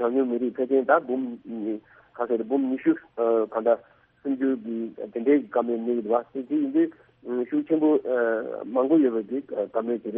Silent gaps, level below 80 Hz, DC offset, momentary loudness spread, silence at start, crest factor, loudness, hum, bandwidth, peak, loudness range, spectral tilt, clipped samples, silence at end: none; -72 dBFS; under 0.1%; 11 LU; 0 s; 20 dB; -25 LUFS; none; 3.7 kHz; -6 dBFS; 2 LU; -6 dB/octave; under 0.1%; 0 s